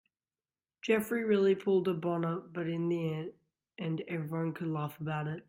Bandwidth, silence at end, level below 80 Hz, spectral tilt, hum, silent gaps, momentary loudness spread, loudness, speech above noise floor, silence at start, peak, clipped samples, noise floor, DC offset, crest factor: 16 kHz; 0.1 s; -76 dBFS; -7.5 dB/octave; none; none; 10 LU; -33 LUFS; over 58 dB; 0.85 s; -16 dBFS; under 0.1%; under -90 dBFS; under 0.1%; 18 dB